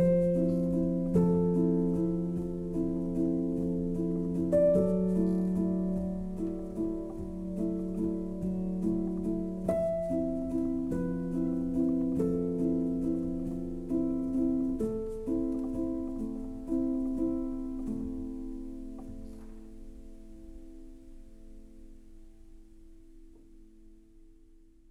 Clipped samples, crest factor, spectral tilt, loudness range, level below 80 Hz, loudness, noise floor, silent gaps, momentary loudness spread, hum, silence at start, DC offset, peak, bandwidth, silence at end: under 0.1%; 16 dB; -10.5 dB/octave; 11 LU; -46 dBFS; -31 LUFS; -56 dBFS; none; 16 LU; none; 0 s; under 0.1%; -14 dBFS; 11 kHz; 0.35 s